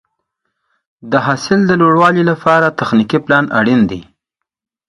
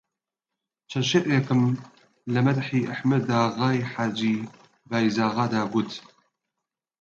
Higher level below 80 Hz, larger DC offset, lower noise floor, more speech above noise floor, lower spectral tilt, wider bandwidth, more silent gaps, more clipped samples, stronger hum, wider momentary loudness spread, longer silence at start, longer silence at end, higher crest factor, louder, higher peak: first, -50 dBFS vs -66 dBFS; neither; second, -78 dBFS vs -87 dBFS; about the same, 66 dB vs 63 dB; about the same, -6.5 dB/octave vs -6 dB/octave; first, 11 kHz vs 7.6 kHz; neither; neither; neither; second, 6 LU vs 11 LU; first, 1.05 s vs 0.9 s; second, 0.85 s vs 1 s; about the same, 14 dB vs 18 dB; first, -12 LUFS vs -25 LUFS; first, 0 dBFS vs -8 dBFS